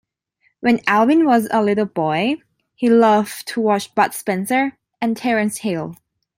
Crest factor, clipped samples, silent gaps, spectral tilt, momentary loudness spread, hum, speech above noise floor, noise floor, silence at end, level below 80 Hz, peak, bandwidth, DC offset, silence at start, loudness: 16 dB; under 0.1%; none; -5 dB/octave; 11 LU; none; 48 dB; -65 dBFS; 0.45 s; -64 dBFS; -2 dBFS; 16.5 kHz; under 0.1%; 0.65 s; -18 LUFS